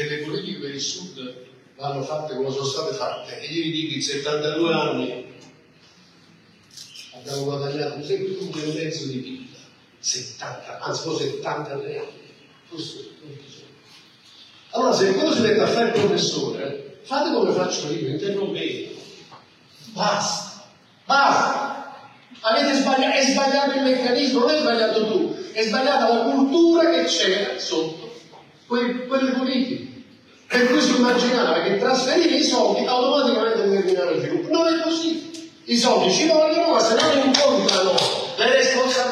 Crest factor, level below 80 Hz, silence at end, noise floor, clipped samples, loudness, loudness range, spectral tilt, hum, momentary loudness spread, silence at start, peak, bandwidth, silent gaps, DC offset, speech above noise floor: 22 dB; -74 dBFS; 0 s; -52 dBFS; under 0.1%; -21 LUFS; 11 LU; -3.5 dB/octave; none; 16 LU; 0 s; 0 dBFS; 13 kHz; none; under 0.1%; 32 dB